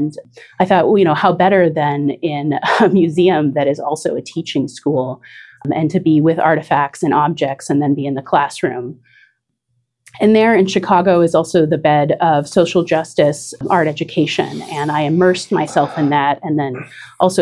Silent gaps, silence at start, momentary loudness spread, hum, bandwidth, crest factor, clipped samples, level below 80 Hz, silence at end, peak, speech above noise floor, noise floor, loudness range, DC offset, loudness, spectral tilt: none; 0 s; 9 LU; none; 12 kHz; 16 dB; under 0.1%; -60 dBFS; 0 s; 0 dBFS; 53 dB; -68 dBFS; 4 LU; under 0.1%; -15 LUFS; -6 dB/octave